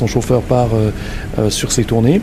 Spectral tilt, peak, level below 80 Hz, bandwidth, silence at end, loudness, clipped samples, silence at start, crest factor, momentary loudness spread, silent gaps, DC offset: -5.5 dB/octave; 0 dBFS; -28 dBFS; 15.5 kHz; 0 s; -16 LUFS; under 0.1%; 0 s; 14 dB; 7 LU; none; under 0.1%